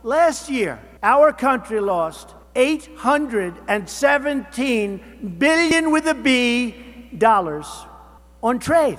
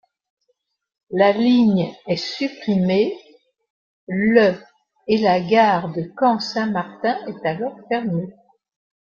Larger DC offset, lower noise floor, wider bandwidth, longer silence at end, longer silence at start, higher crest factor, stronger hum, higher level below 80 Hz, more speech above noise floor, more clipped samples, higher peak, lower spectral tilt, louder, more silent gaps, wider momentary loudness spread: neither; second, -45 dBFS vs -71 dBFS; first, 15.5 kHz vs 7.2 kHz; second, 0 s vs 0.8 s; second, 0.05 s vs 1.1 s; about the same, 20 dB vs 18 dB; neither; first, -48 dBFS vs -62 dBFS; second, 26 dB vs 52 dB; neither; about the same, 0 dBFS vs -2 dBFS; second, -4 dB/octave vs -7 dB/octave; about the same, -19 LUFS vs -19 LUFS; second, none vs 3.70-4.07 s; about the same, 12 LU vs 12 LU